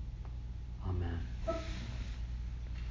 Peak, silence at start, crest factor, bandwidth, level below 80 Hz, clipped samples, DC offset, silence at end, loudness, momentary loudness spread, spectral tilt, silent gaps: -26 dBFS; 0 s; 14 dB; 7.6 kHz; -42 dBFS; under 0.1%; under 0.1%; 0 s; -42 LUFS; 7 LU; -7 dB/octave; none